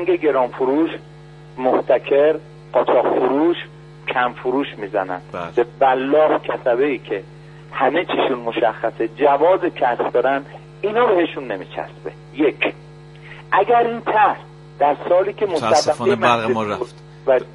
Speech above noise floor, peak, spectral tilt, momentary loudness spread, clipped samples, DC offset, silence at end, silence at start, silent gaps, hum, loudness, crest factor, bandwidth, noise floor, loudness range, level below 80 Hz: 22 dB; 0 dBFS; -5 dB/octave; 12 LU; under 0.1%; under 0.1%; 0 s; 0 s; none; none; -19 LUFS; 18 dB; 11.5 kHz; -40 dBFS; 2 LU; -56 dBFS